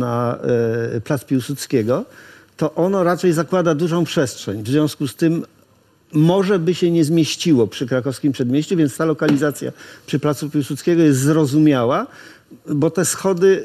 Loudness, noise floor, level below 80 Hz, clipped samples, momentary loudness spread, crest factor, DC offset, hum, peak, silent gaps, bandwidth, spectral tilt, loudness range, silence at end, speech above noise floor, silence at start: -18 LUFS; -55 dBFS; -58 dBFS; under 0.1%; 8 LU; 14 dB; under 0.1%; none; -4 dBFS; none; 15 kHz; -6 dB/octave; 2 LU; 0 s; 37 dB; 0 s